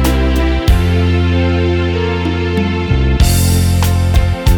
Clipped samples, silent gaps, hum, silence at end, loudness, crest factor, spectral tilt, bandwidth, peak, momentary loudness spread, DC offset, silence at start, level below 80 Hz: under 0.1%; none; none; 0 s; -13 LUFS; 12 dB; -6 dB/octave; 18.5 kHz; 0 dBFS; 4 LU; under 0.1%; 0 s; -16 dBFS